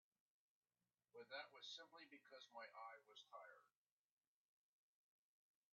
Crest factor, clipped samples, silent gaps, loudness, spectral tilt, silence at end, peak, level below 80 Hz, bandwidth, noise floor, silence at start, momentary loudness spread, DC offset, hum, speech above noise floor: 22 dB; under 0.1%; none; -60 LUFS; 2 dB/octave; 2.05 s; -42 dBFS; under -90 dBFS; 7 kHz; under -90 dBFS; 1.15 s; 9 LU; under 0.1%; none; over 29 dB